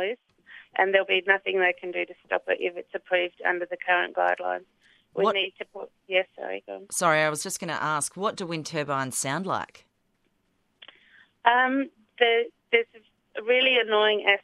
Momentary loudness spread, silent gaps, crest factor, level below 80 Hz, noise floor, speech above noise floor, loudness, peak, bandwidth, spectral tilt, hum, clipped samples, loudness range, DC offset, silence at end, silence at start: 14 LU; none; 22 dB; -78 dBFS; -71 dBFS; 46 dB; -25 LUFS; -4 dBFS; 15 kHz; -2.5 dB/octave; none; under 0.1%; 5 LU; under 0.1%; 0.05 s; 0 s